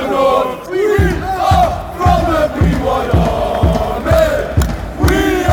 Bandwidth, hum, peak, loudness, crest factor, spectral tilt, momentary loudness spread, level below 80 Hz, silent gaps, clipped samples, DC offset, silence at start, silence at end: 18.5 kHz; none; -2 dBFS; -14 LUFS; 12 dB; -6.5 dB/octave; 4 LU; -20 dBFS; none; under 0.1%; under 0.1%; 0 s; 0 s